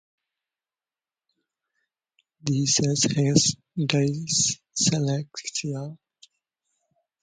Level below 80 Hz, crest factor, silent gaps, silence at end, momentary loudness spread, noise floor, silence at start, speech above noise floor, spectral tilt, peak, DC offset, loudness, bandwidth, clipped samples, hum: -60 dBFS; 26 dB; none; 1.25 s; 11 LU; under -90 dBFS; 2.45 s; over 66 dB; -4 dB/octave; -2 dBFS; under 0.1%; -23 LUFS; 9.6 kHz; under 0.1%; none